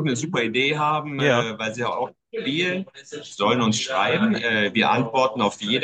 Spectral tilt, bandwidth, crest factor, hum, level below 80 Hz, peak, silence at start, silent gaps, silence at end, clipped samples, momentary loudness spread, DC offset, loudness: -4.5 dB/octave; 9.4 kHz; 18 dB; none; -66 dBFS; -4 dBFS; 0 s; none; 0 s; under 0.1%; 10 LU; under 0.1%; -22 LUFS